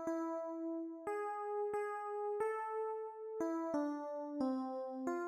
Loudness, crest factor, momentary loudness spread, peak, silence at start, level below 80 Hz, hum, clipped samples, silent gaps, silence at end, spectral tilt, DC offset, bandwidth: -41 LUFS; 14 dB; 4 LU; -26 dBFS; 0 s; -84 dBFS; none; under 0.1%; none; 0 s; -5.5 dB/octave; under 0.1%; 13.5 kHz